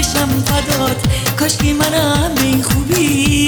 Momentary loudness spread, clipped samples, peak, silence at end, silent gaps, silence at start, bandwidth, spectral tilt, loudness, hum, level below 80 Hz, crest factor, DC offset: 3 LU; under 0.1%; 0 dBFS; 0 s; none; 0 s; over 20 kHz; -4 dB/octave; -14 LUFS; none; -26 dBFS; 14 dB; under 0.1%